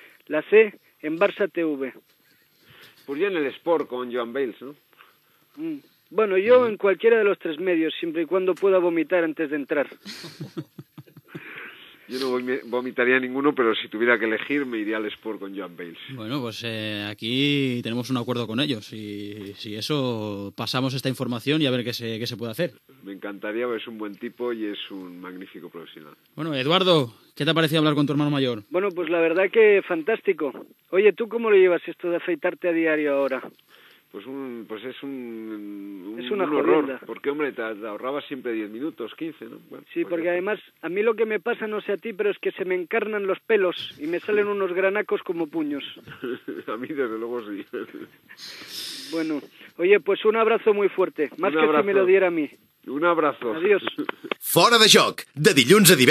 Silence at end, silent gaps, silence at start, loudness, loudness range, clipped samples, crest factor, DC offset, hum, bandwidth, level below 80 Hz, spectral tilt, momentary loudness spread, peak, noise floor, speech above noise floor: 0 s; none; 0.3 s; -23 LUFS; 10 LU; under 0.1%; 24 dB; under 0.1%; none; 15 kHz; -82 dBFS; -4 dB/octave; 18 LU; 0 dBFS; -60 dBFS; 37 dB